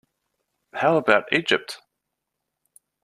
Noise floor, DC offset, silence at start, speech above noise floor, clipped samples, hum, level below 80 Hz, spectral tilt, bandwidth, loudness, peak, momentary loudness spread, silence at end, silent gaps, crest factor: -81 dBFS; under 0.1%; 0.75 s; 60 dB; under 0.1%; none; -68 dBFS; -4.5 dB/octave; 14.5 kHz; -21 LUFS; -2 dBFS; 19 LU; 1.25 s; none; 24 dB